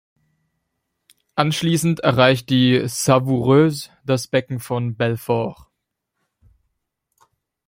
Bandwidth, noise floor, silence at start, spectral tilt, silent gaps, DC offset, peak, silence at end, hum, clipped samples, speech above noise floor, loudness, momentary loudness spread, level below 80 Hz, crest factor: 16.5 kHz; -78 dBFS; 1.35 s; -5.5 dB/octave; none; under 0.1%; 0 dBFS; 2.15 s; none; under 0.1%; 60 dB; -19 LUFS; 9 LU; -56 dBFS; 20 dB